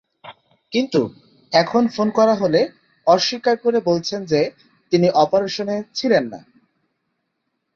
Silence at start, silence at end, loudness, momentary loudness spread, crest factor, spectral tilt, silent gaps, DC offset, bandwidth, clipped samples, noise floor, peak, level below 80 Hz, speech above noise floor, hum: 0.25 s; 1.35 s; -19 LUFS; 8 LU; 18 dB; -5.5 dB/octave; none; under 0.1%; 7.4 kHz; under 0.1%; -74 dBFS; -2 dBFS; -62 dBFS; 56 dB; none